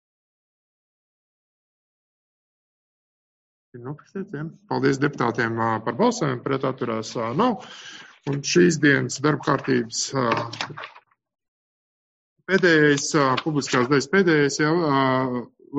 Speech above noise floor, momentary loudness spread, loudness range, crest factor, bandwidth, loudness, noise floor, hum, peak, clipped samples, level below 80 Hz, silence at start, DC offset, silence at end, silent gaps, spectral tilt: over 68 dB; 17 LU; 8 LU; 20 dB; 9 kHz; -22 LUFS; under -90 dBFS; none; -4 dBFS; under 0.1%; -64 dBFS; 3.75 s; under 0.1%; 0 s; 11.48-12.36 s; -5 dB/octave